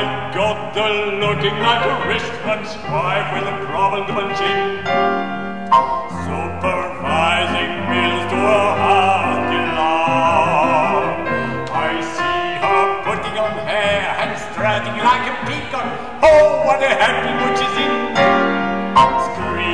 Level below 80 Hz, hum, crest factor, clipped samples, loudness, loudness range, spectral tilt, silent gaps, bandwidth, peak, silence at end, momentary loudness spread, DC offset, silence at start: -44 dBFS; none; 14 dB; under 0.1%; -17 LUFS; 4 LU; -5 dB/octave; none; 10.5 kHz; -2 dBFS; 0 s; 8 LU; 2%; 0 s